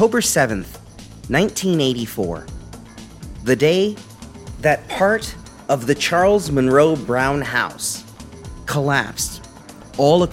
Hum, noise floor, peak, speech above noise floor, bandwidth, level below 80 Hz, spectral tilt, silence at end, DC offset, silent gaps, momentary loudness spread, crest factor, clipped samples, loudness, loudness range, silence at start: none; -40 dBFS; -2 dBFS; 22 dB; 16.5 kHz; -42 dBFS; -4.5 dB/octave; 0 s; under 0.1%; none; 22 LU; 18 dB; under 0.1%; -18 LUFS; 4 LU; 0 s